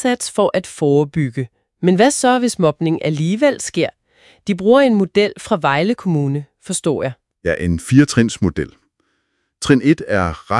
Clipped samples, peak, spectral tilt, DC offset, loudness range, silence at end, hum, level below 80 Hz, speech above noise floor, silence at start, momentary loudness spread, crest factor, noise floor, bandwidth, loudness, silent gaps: under 0.1%; 0 dBFS; -5.5 dB/octave; under 0.1%; 2 LU; 0 s; none; -46 dBFS; 52 dB; 0 s; 11 LU; 16 dB; -68 dBFS; 12 kHz; -17 LUFS; none